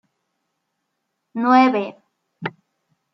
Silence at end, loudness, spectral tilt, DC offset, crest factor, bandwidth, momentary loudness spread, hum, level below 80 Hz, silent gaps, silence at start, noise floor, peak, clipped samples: 0.65 s; -17 LUFS; -6.5 dB/octave; under 0.1%; 20 dB; 6 kHz; 18 LU; none; -80 dBFS; none; 1.35 s; -76 dBFS; -2 dBFS; under 0.1%